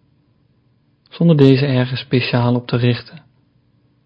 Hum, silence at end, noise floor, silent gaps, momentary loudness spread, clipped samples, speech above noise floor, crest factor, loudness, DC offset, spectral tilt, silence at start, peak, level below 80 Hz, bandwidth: none; 0.85 s; -59 dBFS; none; 7 LU; 0.1%; 44 dB; 18 dB; -16 LUFS; under 0.1%; -9.5 dB/octave; 1.15 s; 0 dBFS; -54 dBFS; 5.4 kHz